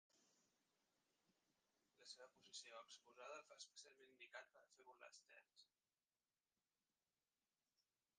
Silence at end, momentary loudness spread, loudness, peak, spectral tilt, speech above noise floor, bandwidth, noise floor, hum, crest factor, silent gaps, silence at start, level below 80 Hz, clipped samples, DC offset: 0.35 s; 8 LU; -62 LUFS; -44 dBFS; 0.5 dB/octave; over 26 dB; 9.4 kHz; under -90 dBFS; none; 24 dB; none; 0.15 s; under -90 dBFS; under 0.1%; under 0.1%